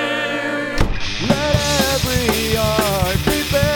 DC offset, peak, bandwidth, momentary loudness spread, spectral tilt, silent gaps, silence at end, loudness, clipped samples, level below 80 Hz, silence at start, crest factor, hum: under 0.1%; 0 dBFS; over 20 kHz; 5 LU; -4 dB/octave; none; 0 s; -18 LUFS; under 0.1%; -28 dBFS; 0 s; 18 dB; none